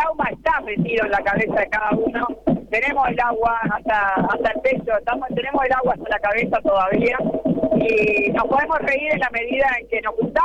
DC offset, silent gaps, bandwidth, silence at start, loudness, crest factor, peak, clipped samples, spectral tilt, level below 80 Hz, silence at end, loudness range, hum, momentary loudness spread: under 0.1%; none; 9.2 kHz; 0 s; -20 LUFS; 14 dB; -6 dBFS; under 0.1%; -7 dB/octave; -44 dBFS; 0 s; 1 LU; none; 4 LU